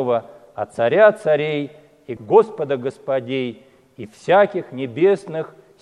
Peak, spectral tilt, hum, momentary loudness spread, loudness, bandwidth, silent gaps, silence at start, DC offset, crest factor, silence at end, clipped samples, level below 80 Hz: 0 dBFS; -6.5 dB/octave; none; 20 LU; -19 LUFS; 11 kHz; none; 0 s; under 0.1%; 20 dB; 0.35 s; under 0.1%; -68 dBFS